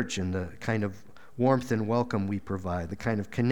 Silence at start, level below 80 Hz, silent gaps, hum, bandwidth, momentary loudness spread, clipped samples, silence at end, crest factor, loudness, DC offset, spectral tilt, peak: 0 s; -54 dBFS; none; none; 17.5 kHz; 7 LU; under 0.1%; 0 s; 20 dB; -30 LUFS; 0.5%; -6.5 dB/octave; -10 dBFS